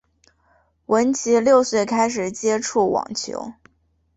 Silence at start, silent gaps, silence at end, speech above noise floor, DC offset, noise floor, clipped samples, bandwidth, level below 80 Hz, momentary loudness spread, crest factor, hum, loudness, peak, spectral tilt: 0.9 s; none; 0.65 s; 44 dB; under 0.1%; -64 dBFS; under 0.1%; 8.2 kHz; -60 dBFS; 12 LU; 18 dB; none; -20 LUFS; -4 dBFS; -3.5 dB/octave